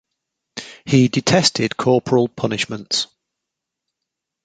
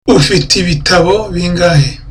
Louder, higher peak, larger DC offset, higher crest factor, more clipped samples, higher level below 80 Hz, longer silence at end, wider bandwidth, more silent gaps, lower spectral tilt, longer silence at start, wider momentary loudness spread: second, -18 LUFS vs -10 LUFS; about the same, -2 dBFS vs 0 dBFS; neither; first, 20 dB vs 10 dB; neither; second, -56 dBFS vs -26 dBFS; first, 1.4 s vs 0 s; second, 9.4 kHz vs 14.5 kHz; neither; about the same, -4.5 dB/octave vs -4.5 dB/octave; first, 0.55 s vs 0.05 s; first, 17 LU vs 4 LU